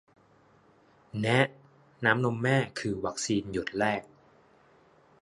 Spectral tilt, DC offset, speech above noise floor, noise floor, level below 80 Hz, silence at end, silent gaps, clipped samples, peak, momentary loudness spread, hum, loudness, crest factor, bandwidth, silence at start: -5 dB/octave; under 0.1%; 34 dB; -62 dBFS; -62 dBFS; 1.2 s; none; under 0.1%; -6 dBFS; 7 LU; none; -29 LUFS; 24 dB; 11.5 kHz; 1.15 s